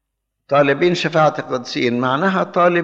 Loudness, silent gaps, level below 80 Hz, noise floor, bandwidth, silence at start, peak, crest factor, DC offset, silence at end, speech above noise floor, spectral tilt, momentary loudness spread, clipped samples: -17 LUFS; none; -68 dBFS; -57 dBFS; 7.8 kHz; 0.5 s; -2 dBFS; 14 dB; under 0.1%; 0 s; 40 dB; -6 dB/octave; 5 LU; under 0.1%